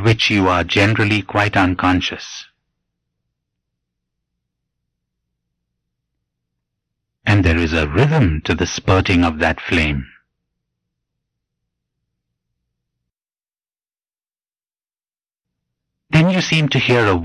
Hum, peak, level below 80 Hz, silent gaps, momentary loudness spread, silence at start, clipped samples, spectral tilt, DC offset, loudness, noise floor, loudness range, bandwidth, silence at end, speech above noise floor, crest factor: none; -6 dBFS; -34 dBFS; none; 6 LU; 0 s; under 0.1%; -5.5 dB/octave; under 0.1%; -16 LUFS; under -90 dBFS; 9 LU; 11 kHz; 0 s; over 74 dB; 14 dB